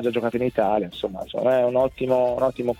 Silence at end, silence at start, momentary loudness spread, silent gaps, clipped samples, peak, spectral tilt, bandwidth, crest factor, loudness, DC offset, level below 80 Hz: 0.05 s; 0 s; 8 LU; none; under 0.1%; -8 dBFS; -7 dB/octave; 15 kHz; 16 dB; -23 LUFS; under 0.1%; -52 dBFS